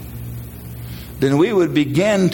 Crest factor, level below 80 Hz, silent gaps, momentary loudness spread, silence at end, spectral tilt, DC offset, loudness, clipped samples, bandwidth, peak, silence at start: 14 dB; -40 dBFS; none; 17 LU; 0 s; -6.5 dB/octave; under 0.1%; -17 LUFS; under 0.1%; 17 kHz; -4 dBFS; 0 s